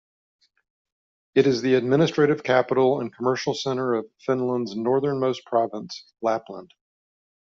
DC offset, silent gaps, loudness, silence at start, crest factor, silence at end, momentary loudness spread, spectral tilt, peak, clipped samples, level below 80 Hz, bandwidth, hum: under 0.1%; none; -23 LUFS; 1.35 s; 20 dB; 0.8 s; 9 LU; -5 dB/octave; -4 dBFS; under 0.1%; -68 dBFS; 7.6 kHz; none